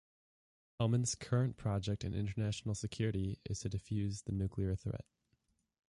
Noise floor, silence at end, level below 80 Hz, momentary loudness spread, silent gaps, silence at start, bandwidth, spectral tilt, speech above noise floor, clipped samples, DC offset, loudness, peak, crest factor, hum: -80 dBFS; 0.85 s; -54 dBFS; 6 LU; none; 0.8 s; 11.5 kHz; -6 dB/octave; 43 dB; under 0.1%; under 0.1%; -38 LUFS; -22 dBFS; 16 dB; none